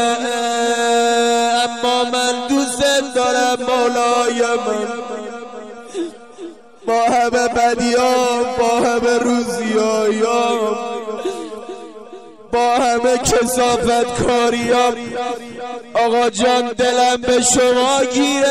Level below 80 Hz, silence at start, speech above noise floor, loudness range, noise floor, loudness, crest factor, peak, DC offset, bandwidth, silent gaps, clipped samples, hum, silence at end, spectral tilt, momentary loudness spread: -46 dBFS; 0 s; 21 dB; 4 LU; -37 dBFS; -16 LUFS; 12 dB; -4 dBFS; 0.4%; 15.5 kHz; none; under 0.1%; none; 0 s; -2.5 dB/octave; 14 LU